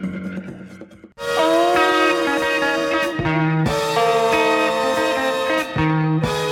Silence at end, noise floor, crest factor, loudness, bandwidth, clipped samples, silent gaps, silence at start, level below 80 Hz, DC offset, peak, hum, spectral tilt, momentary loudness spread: 0 s; -41 dBFS; 14 dB; -18 LUFS; 17 kHz; under 0.1%; none; 0 s; -46 dBFS; under 0.1%; -6 dBFS; none; -5 dB/octave; 12 LU